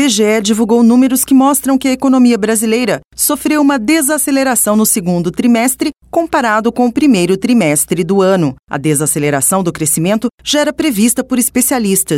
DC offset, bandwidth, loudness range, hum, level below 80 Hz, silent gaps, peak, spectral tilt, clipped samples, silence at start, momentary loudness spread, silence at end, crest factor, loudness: under 0.1%; 17 kHz; 2 LU; none; -46 dBFS; 8.59-8.63 s, 10.34-10.38 s; -2 dBFS; -4 dB/octave; under 0.1%; 0 s; 5 LU; 0 s; 10 dB; -12 LUFS